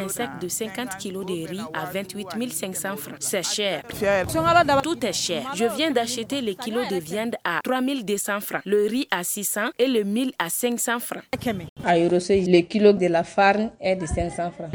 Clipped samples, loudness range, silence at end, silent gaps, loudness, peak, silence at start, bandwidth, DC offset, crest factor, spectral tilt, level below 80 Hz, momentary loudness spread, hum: under 0.1%; 6 LU; 0 s; 11.69-11.76 s; -23 LUFS; -4 dBFS; 0 s; over 20 kHz; under 0.1%; 20 dB; -4 dB/octave; -48 dBFS; 11 LU; none